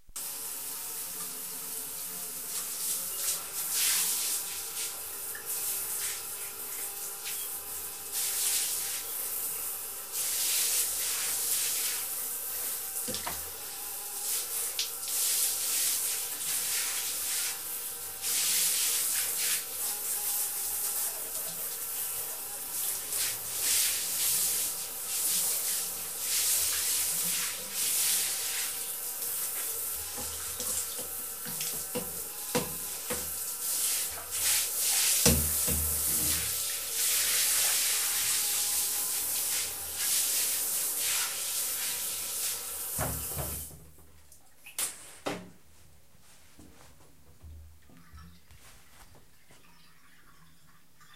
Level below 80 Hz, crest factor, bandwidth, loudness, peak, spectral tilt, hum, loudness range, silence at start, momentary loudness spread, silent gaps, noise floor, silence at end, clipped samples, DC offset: -54 dBFS; 26 dB; 16 kHz; -29 LUFS; -6 dBFS; 0 dB/octave; none; 7 LU; 0.1 s; 10 LU; none; -62 dBFS; 0 s; under 0.1%; 0.2%